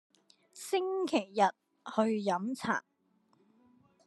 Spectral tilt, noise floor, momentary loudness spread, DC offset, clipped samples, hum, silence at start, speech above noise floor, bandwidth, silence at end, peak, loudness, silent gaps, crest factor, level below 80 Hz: -4.5 dB/octave; -71 dBFS; 6 LU; under 0.1%; under 0.1%; none; 0.55 s; 40 dB; 12.5 kHz; 1.25 s; -12 dBFS; -33 LUFS; none; 22 dB; -82 dBFS